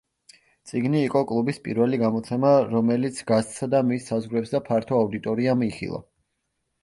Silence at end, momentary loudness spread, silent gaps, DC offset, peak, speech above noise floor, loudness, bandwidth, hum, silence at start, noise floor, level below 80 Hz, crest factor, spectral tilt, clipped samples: 0.8 s; 8 LU; none; under 0.1%; -6 dBFS; 54 dB; -24 LUFS; 11.5 kHz; none; 0.65 s; -77 dBFS; -60 dBFS; 18 dB; -7 dB/octave; under 0.1%